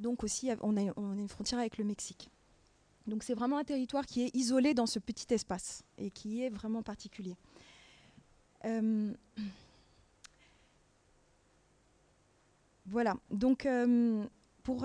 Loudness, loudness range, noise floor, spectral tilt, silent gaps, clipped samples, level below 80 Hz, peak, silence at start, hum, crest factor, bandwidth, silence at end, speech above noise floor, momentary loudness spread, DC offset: -35 LUFS; 8 LU; -70 dBFS; -4.5 dB/octave; none; under 0.1%; -64 dBFS; -18 dBFS; 0 s; none; 18 dB; 10.5 kHz; 0 s; 35 dB; 15 LU; under 0.1%